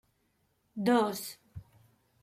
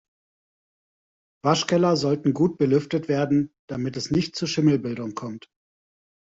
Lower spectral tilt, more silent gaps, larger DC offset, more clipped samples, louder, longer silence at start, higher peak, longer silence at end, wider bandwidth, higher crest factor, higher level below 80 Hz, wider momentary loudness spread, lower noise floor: about the same, -5 dB/octave vs -6 dB/octave; second, none vs 3.59-3.68 s; neither; neither; second, -30 LUFS vs -23 LUFS; second, 0.75 s vs 1.45 s; second, -14 dBFS vs -6 dBFS; second, 0.6 s vs 1 s; first, 16 kHz vs 7.8 kHz; about the same, 20 dB vs 20 dB; second, -68 dBFS vs -60 dBFS; first, 24 LU vs 11 LU; second, -74 dBFS vs under -90 dBFS